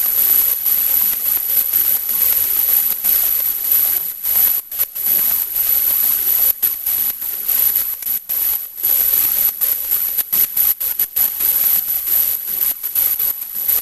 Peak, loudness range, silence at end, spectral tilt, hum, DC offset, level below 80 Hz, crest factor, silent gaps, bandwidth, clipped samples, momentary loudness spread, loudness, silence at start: -2 dBFS; 2 LU; 0 s; 1 dB/octave; none; under 0.1%; -50 dBFS; 16 dB; none; 16 kHz; under 0.1%; 5 LU; -14 LUFS; 0 s